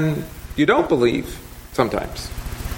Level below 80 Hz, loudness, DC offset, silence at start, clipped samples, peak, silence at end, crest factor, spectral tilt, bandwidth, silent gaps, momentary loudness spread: -36 dBFS; -21 LUFS; under 0.1%; 0 s; under 0.1%; -2 dBFS; 0 s; 20 dB; -6 dB/octave; 17 kHz; none; 15 LU